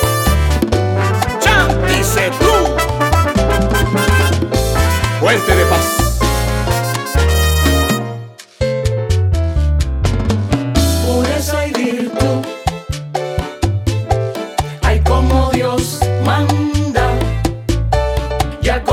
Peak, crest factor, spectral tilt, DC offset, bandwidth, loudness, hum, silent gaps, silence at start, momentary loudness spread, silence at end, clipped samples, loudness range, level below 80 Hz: 0 dBFS; 14 dB; -5 dB/octave; under 0.1%; 18 kHz; -15 LUFS; none; none; 0 s; 7 LU; 0 s; under 0.1%; 4 LU; -22 dBFS